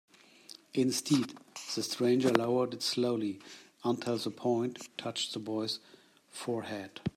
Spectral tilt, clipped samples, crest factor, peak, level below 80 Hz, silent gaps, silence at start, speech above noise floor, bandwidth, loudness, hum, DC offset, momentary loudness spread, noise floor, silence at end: -4.5 dB/octave; under 0.1%; 24 dB; -10 dBFS; -72 dBFS; none; 0.75 s; 23 dB; 16 kHz; -33 LUFS; none; under 0.1%; 13 LU; -55 dBFS; 0.05 s